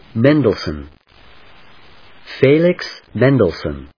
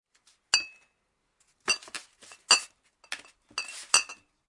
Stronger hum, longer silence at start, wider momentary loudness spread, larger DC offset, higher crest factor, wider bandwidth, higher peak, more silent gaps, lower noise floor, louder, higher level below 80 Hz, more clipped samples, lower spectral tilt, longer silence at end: neither; second, 0.15 s vs 0.55 s; second, 14 LU vs 19 LU; first, 0.3% vs under 0.1%; second, 18 dB vs 30 dB; second, 5.4 kHz vs 11.5 kHz; about the same, 0 dBFS vs -2 dBFS; neither; second, -46 dBFS vs -76 dBFS; first, -15 LUFS vs -26 LUFS; first, -42 dBFS vs -74 dBFS; neither; first, -8 dB/octave vs 2.5 dB/octave; second, 0.1 s vs 0.35 s